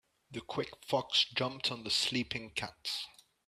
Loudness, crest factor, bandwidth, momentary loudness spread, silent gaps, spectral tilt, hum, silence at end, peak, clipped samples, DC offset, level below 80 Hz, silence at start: -34 LUFS; 22 dB; 15 kHz; 11 LU; none; -3 dB/octave; none; 0.4 s; -14 dBFS; under 0.1%; under 0.1%; -68 dBFS; 0.3 s